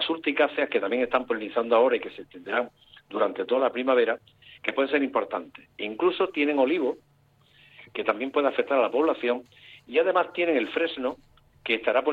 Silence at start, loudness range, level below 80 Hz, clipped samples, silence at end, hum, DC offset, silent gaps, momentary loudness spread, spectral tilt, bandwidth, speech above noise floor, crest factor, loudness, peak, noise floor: 0 s; 2 LU; -68 dBFS; under 0.1%; 0 s; none; under 0.1%; none; 12 LU; -6 dB/octave; 4.8 kHz; 36 dB; 18 dB; -26 LUFS; -8 dBFS; -61 dBFS